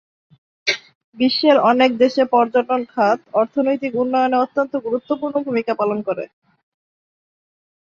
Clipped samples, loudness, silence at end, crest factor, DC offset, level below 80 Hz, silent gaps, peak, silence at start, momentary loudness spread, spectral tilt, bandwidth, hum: under 0.1%; -18 LUFS; 1.6 s; 16 dB; under 0.1%; -68 dBFS; 0.95-1.13 s; -2 dBFS; 0.65 s; 9 LU; -5 dB/octave; 7.2 kHz; none